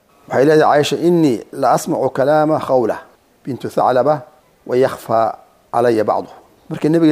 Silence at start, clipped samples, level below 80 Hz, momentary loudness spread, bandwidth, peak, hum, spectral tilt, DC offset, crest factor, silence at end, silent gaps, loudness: 0.3 s; under 0.1%; -60 dBFS; 12 LU; 15.5 kHz; -2 dBFS; none; -6 dB/octave; under 0.1%; 14 dB; 0 s; none; -16 LUFS